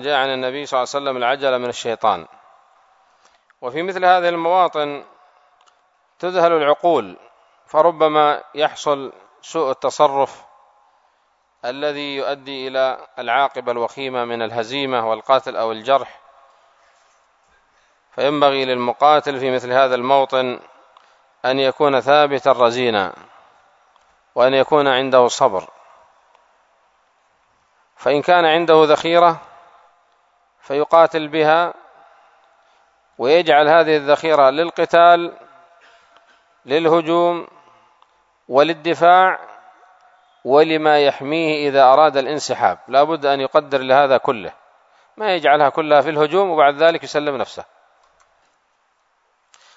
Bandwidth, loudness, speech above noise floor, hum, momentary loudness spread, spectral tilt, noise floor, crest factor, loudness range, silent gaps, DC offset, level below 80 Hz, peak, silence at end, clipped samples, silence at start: 8 kHz; -17 LUFS; 48 dB; none; 12 LU; -4.5 dB/octave; -64 dBFS; 18 dB; 7 LU; none; under 0.1%; -70 dBFS; 0 dBFS; 2.15 s; under 0.1%; 0 s